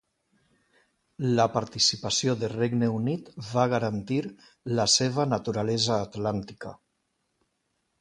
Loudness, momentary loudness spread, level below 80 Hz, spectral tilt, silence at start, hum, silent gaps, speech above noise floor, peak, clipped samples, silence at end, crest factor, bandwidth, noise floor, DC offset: -26 LUFS; 12 LU; -60 dBFS; -4 dB/octave; 1.2 s; none; none; 50 dB; -8 dBFS; under 0.1%; 1.25 s; 20 dB; 11.5 kHz; -76 dBFS; under 0.1%